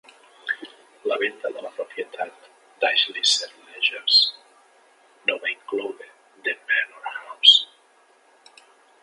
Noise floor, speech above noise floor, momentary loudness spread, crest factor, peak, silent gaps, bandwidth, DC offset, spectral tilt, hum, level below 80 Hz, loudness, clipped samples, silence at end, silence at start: -58 dBFS; 36 dB; 19 LU; 24 dB; 0 dBFS; none; 11.5 kHz; under 0.1%; 1.5 dB/octave; none; under -90 dBFS; -21 LUFS; under 0.1%; 1.4 s; 0.45 s